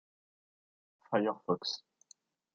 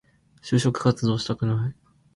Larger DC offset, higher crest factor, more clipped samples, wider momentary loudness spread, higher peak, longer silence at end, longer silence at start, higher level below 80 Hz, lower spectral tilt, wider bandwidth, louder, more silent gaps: neither; first, 24 dB vs 18 dB; neither; about the same, 7 LU vs 8 LU; second, -14 dBFS vs -6 dBFS; first, 0.8 s vs 0.45 s; first, 1.1 s vs 0.45 s; second, -84 dBFS vs -54 dBFS; second, -5 dB/octave vs -6.5 dB/octave; second, 7.6 kHz vs 11.5 kHz; second, -35 LUFS vs -24 LUFS; neither